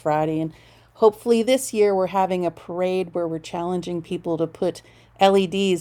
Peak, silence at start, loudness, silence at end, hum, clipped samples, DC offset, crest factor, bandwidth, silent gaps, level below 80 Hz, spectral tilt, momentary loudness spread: -2 dBFS; 0.05 s; -22 LUFS; 0 s; none; under 0.1%; under 0.1%; 20 dB; 18 kHz; none; -58 dBFS; -5.5 dB/octave; 10 LU